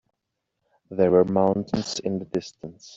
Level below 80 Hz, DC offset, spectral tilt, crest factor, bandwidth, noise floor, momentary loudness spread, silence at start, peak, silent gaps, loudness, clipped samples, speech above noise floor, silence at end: -60 dBFS; under 0.1%; -6 dB/octave; 20 dB; 7.8 kHz; -80 dBFS; 17 LU; 0.9 s; -4 dBFS; none; -23 LUFS; under 0.1%; 57 dB; 0 s